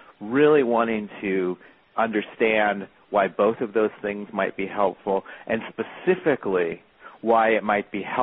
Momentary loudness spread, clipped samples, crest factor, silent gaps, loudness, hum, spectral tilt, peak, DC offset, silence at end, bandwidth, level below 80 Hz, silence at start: 10 LU; under 0.1%; 16 dB; none; -24 LUFS; none; -4 dB/octave; -6 dBFS; under 0.1%; 0 s; 4 kHz; -62 dBFS; 0.2 s